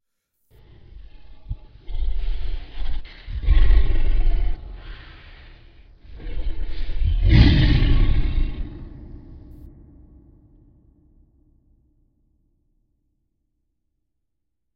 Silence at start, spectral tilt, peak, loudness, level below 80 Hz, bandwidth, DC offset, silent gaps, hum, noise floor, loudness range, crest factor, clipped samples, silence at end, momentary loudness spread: 0.95 s; -8.5 dB/octave; 0 dBFS; -23 LUFS; -22 dBFS; 5.4 kHz; under 0.1%; none; none; -80 dBFS; 14 LU; 20 dB; under 0.1%; 5.4 s; 25 LU